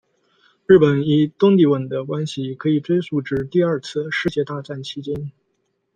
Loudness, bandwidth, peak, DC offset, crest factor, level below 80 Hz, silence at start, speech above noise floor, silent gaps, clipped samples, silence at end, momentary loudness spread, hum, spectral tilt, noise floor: -19 LUFS; 9.2 kHz; 0 dBFS; under 0.1%; 18 dB; -54 dBFS; 0.7 s; 52 dB; none; under 0.1%; 0.65 s; 15 LU; none; -7.5 dB/octave; -70 dBFS